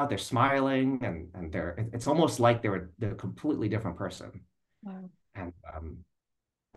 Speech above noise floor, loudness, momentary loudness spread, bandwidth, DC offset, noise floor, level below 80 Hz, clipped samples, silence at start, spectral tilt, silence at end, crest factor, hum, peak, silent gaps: 55 dB; -30 LUFS; 20 LU; 12.5 kHz; under 0.1%; -86 dBFS; -54 dBFS; under 0.1%; 0 s; -6 dB/octave; 0.75 s; 22 dB; none; -10 dBFS; none